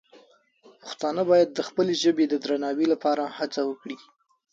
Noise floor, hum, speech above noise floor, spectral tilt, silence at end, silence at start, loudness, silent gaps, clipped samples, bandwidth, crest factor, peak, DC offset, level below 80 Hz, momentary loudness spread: -57 dBFS; none; 33 dB; -5 dB/octave; 0.55 s; 0.85 s; -25 LUFS; none; under 0.1%; 7.8 kHz; 18 dB; -8 dBFS; under 0.1%; -74 dBFS; 18 LU